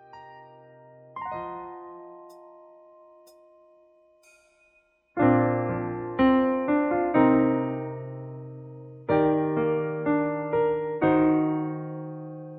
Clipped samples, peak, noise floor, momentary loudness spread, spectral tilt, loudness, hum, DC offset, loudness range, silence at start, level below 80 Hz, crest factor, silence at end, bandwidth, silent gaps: under 0.1%; -8 dBFS; -65 dBFS; 21 LU; -10 dB/octave; -25 LUFS; none; under 0.1%; 18 LU; 0.15 s; -58 dBFS; 18 dB; 0 s; 4.6 kHz; none